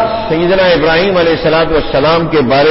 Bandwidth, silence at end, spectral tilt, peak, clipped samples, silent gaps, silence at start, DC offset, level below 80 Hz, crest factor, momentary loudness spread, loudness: 5.8 kHz; 0 s; -9 dB/octave; 0 dBFS; under 0.1%; none; 0 s; under 0.1%; -30 dBFS; 8 dB; 3 LU; -10 LUFS